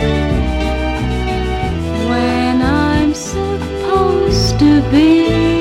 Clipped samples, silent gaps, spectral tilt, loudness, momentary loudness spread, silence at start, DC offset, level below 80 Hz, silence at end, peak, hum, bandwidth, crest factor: under 0.1%; none; -6 dB/octave; -14 LUFS; 8 LU; 0 s; under 0.1%; -22 dBFS; 0 s; 0 dBFS; none; 13 kHz; 12 dB